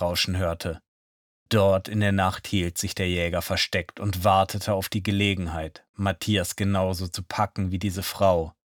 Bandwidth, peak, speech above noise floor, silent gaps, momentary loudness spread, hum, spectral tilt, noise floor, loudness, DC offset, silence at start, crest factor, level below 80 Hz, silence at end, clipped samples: 19 kHz; -8 dBFS; over 65 dB; 0.88-1.46 s, 5.89-5.94 s; 9 LU; none; -5 dB/octave; under -90 dBFS; -25 LUFS; under 0.1%; 0 s; 18 dB; -46 dBFS; 0.15 s; under 0.1%